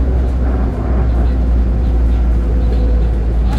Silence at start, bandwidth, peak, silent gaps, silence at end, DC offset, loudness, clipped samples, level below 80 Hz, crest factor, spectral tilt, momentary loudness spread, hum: 0 s; 4.5 kHz; -4 dBFS; none; 0 s; under 0.1%; -16 LUFS; under 0.1%; -14 dBFS; 10 dB; -9.5 dB/octave; 2 LU; none